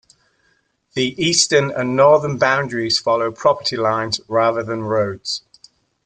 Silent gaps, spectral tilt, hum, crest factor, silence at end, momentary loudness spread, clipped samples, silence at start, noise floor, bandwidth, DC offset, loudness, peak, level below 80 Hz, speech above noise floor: none; -3.5 dB/octave; none; 18 dB; 0.7 s; 9 LU; under 0.1%; 0.95 s; -63 dBFS; 9.6 kHz; under 0.1%; -17 LUFS; -2 dBFS; -58 dBFS; 46 dB